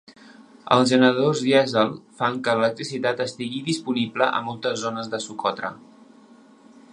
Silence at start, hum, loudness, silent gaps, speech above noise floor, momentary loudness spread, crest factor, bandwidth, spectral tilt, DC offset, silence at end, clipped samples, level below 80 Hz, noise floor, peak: 0.1 s; none; -22 LUFS; none; 28 dB; 11 LU; 22 dB; 10.5 kHz; -4.5 dB/octave; under 0.1%; 1.15 s; under 0.1%; -70 dBFS; -51 dBFS; -2 dBFS